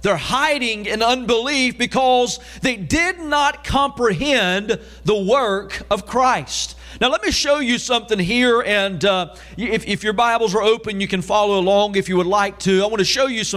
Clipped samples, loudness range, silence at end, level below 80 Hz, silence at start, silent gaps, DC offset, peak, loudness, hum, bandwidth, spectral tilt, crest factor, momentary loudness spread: under 0.1%; 1 LU; 0 s; -40 dBFS; 0 s; none; under 0.1%; -4 dBFS; -18 LUFS; none; 15.5 kHz; -3.5 dB/octave; 14 dB; 6 LU